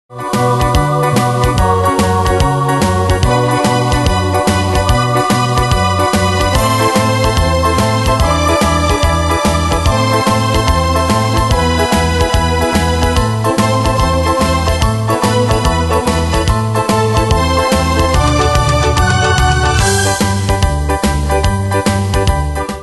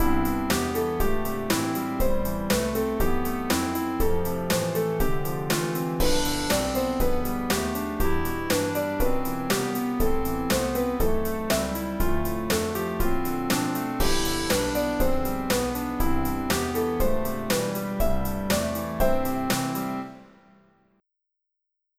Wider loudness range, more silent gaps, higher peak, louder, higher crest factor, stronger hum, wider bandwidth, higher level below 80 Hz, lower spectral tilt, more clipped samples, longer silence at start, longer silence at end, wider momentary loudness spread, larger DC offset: about the same, 1 LU vs 1 LU; neither; first, 0 dBFS vs -10 dBFS; first, -12 LUFS vs -26 LUFS; about the same, 12 dB vs 16 dB; neither; second, 12.5 kHz vs 16 kHz; first, -20 dBFS vs -32 dBFS; about the same, -5 dB/octave vs -4.5 dB/octave; neither; about the same, 0.1 s vs 0 s; second, 0 s vs 1.75 s; about the same, 2 LU vs 4 LU; neither